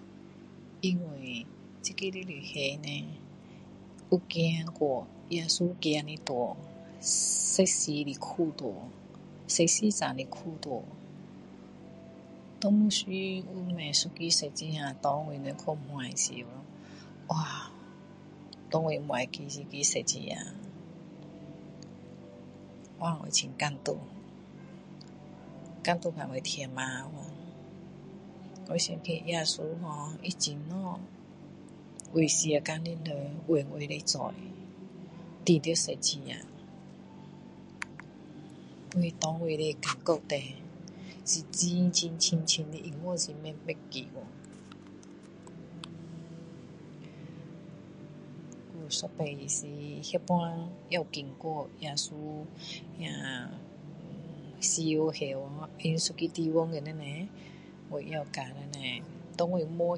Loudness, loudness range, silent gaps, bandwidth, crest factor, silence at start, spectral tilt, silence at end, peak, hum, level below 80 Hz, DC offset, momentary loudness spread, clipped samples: -32 LUFS; 8 LU; none; 11.5 kHz; 24 dB; 0 s; -3.5 dB/octave; 0 s; -10 dBFS; none; -70 dBFS; under 0.1%; 22 LU; under 0.1%